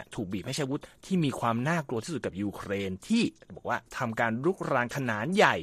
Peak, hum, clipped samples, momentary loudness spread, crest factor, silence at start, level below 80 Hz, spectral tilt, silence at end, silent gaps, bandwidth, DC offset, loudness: -6 dBFS; none; under 0.1%; 7 LU; 24 dB; 0 s; -62 dBFS; -5.5 dB/octave; 0 s; none; 15 kHz; under 0.1%; -30 LUFS